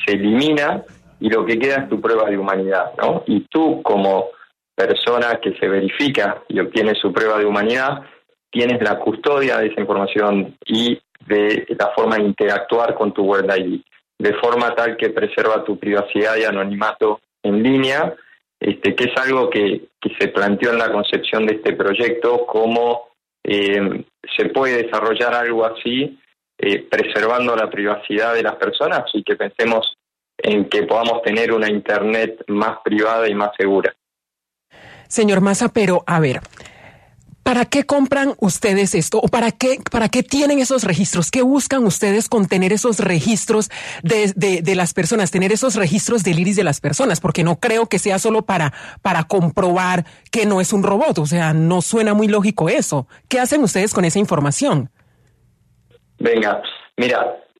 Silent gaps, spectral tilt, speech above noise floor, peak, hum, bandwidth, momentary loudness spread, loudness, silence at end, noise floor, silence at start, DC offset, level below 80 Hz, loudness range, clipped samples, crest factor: none; -4.5 dB/octave; 67 dB; -2 dBFS; none; 13.5 kHz; 5 LU; -17 LUFS; 0.2 s; -84 dBFS; 0 s; under 0.1%; -54 dBFS; 2 LU; under 0.1%; 16 dB